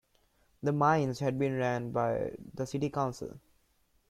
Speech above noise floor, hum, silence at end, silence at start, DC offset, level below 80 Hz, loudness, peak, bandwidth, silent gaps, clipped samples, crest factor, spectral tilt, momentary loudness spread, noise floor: 40 dB; none; 0.7 s; 0.6 s; under 0.1%; -62 dBFS; -32 LUFS; -14 dBFS; 14 kHz; none; under 0.1%; 20 dB; -7 dB/octave; 12 LU; -71 dBFS